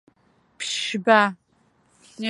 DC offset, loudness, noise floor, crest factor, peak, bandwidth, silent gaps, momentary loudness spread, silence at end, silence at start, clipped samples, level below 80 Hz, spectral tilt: under 0.1%; -21 LUFS; -63 dBFS; 24 dB; -2 dBFS; 11.5 kHz; none; 11 LU; 0 s; 0.6 s; under 0.1%; -76 dBFS; -3 dB/octave